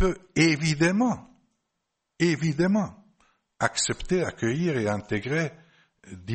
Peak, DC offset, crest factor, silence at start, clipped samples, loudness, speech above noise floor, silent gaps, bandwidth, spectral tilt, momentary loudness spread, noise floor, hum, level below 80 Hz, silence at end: -6 dBFS; under 0.1%; 20 dB; 0 s; under 0.1%; -26 LUFS; 56 dB; none; 8.8 kHz; -5 dB/octave; 7 LU; -81 dBFS; none; -46 dBFS; 0 s